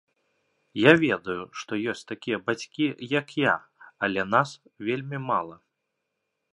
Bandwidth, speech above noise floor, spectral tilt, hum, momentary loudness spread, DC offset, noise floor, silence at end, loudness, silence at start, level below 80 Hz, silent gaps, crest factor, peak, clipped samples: 11 kHz; 55 dB; -5.5 dB/octave; none; 14 LU; under 0.1%; -80 dBFS; 1 s; -26 LUFS; 0.75 s; -66 dBFS; none; 26 dB; 0 dBFS; under 0.1%